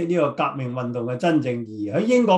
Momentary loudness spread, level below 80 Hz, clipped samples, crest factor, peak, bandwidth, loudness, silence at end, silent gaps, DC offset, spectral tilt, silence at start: 8 LU; -64 dBFS; under 0.1%; 16 dB; -4 dBFS; 10.5 kHz; -23 LUFS; 0 s; none; under 0.1%; -7 dB/octave; 0 s